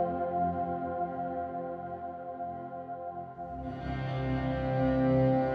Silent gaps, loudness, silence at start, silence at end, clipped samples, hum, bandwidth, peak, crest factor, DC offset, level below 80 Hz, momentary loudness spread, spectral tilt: none; -33 LUFS; 0 s; 0 s; under 0.1%; none; 5 kHz; -16 dBFS; 16 dB; under 0.1%; -48 dBFS; 14 LU; -10 dB/octave